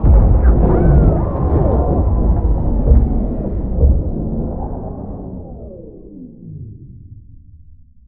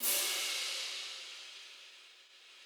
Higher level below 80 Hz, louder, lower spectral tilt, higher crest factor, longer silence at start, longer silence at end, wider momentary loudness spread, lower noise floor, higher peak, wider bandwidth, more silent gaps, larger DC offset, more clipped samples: first, -16 dBFS vs under -90 dBFS; first, -16 LUFS vs -35 LUFS; first, -14.5 dB/octave vs 3.5 dB/octave; second, 14 dB vs 22 dB; about the same, 0 s vs 0 s; first, 0.7 s vs 0 s; about the same, 22 LU vs 24 LU; second, -42 dBFS vs -59 dBFS; first, 0 dBFS vs -18 dBFS; second, 2.3 kHz vs over 20 kHz; neither; neither; neither